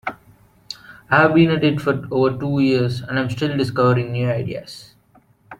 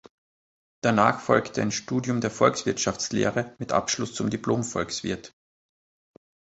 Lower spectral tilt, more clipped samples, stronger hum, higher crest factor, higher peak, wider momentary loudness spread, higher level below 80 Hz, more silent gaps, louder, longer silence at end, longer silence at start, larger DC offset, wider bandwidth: first, -7.5 dB/octave vs -4.5 dB/octave; neither; neither; second, 18 dB vs 24 dB; about the same, -2 dBFS vs -4 dBFS; first, 20 LU vs 8 LU; first, -52 dBFS vs -58 dBFS; neither; first, -18 LUFS vs -25 LUFS; second, 0.05 s vs 1.3 s; second, 0.05 s vs 0.85 s; neither; first, 13.5 kHz vs 8.2 kHz